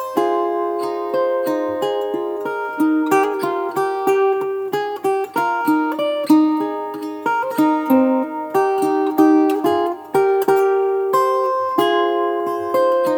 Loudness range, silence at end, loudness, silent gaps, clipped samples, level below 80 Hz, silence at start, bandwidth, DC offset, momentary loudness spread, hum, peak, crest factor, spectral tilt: 3 LU; 0 s; -18 LUFS; none; under 0.1%; -70 dBFS; 0 s; 19.5 kHz; under 0.1%; 7 LU; none; -2 dBFS; 16 dB; -5 dB/octave